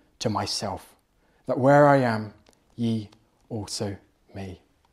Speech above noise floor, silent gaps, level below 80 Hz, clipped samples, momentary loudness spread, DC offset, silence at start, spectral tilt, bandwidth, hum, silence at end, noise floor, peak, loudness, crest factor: 41 dB; none; -64 dBFS; under 0.1%; 24 LU; under 0.1%; 0.2 s; -5.5 dB/octave; 14 kHz; none; 0.4 s; -64 dBFS; -4 dBFS; -24 LUFS; 22 dB